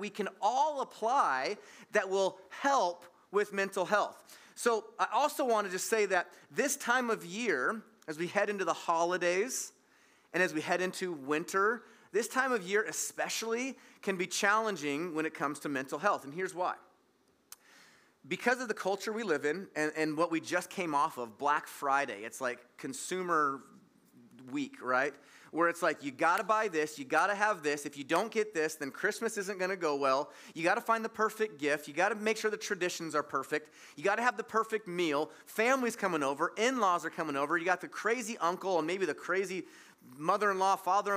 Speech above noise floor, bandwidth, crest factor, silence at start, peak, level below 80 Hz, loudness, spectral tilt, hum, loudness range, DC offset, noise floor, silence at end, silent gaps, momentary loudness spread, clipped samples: 38 dB; 16 kHz; 20 dB; 0 s; -12 dBFS; under -90 dBFS; -33 LUFS; -3 dB/octave; none; 4 LU; under 0.1%; -70 dBFS; 0 s; none; 8 LU; under 0.1%